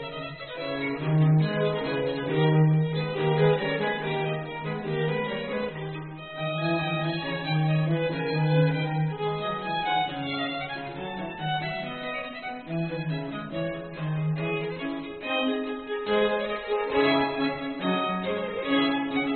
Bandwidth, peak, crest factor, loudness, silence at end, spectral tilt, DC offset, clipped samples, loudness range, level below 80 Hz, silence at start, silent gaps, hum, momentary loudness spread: 4.4 kHz; -10 dBFS; 18 dB; -27 LUFS; 0 s; -5 dB/octave; under 0.1%; under 0.1%; 7 LU; -58 dBFS; 0 s; none; none; 10 LU